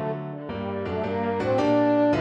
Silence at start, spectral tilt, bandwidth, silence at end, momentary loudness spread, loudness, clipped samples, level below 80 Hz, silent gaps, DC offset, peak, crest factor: 0 s; -8 dB/octave; 7.8 kHz; 0 s; 12 LU; -25 LUFS; under 0.1%; -54 dBFS; none; under 0.1%; -12 dBFS; 12 dB